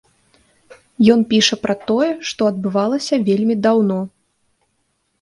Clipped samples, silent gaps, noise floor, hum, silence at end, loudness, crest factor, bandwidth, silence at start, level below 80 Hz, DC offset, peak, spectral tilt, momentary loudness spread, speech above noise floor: under 0.1%; none; -67 dBFS; none; 1.15 s; -17 LUFS; 18 dB; 11 kHz; 1 s; -58 dBFS; under 0.1%; 0 dBFS; -5 dB/octave; 7 LU; 51 dB